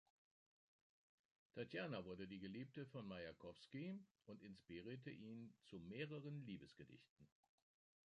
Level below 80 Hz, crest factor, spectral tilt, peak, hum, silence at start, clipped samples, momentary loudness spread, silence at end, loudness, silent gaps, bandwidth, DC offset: -82 dBFS; 20 dB; -7.5 dB/octave; -36 dBFS; none; 1.55 s; under 0.1%; 11 LU; 0.75 s; -55 LUFS; 4.11-4.15 s, 7.09-7.17 s; 10 kHz; under 0.1%